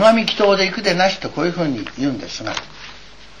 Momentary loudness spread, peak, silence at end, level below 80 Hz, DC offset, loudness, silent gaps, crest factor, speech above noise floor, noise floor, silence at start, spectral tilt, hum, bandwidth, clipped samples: 14 LU; -2 dBFS; 0.15 s; -50 dBFS; 1%; -18 LUFS; none; 16 dB; 23 dB; -42 dBFS; 0 s; -4.5 dB/octave; none; 11.5 kHz; under 0.1%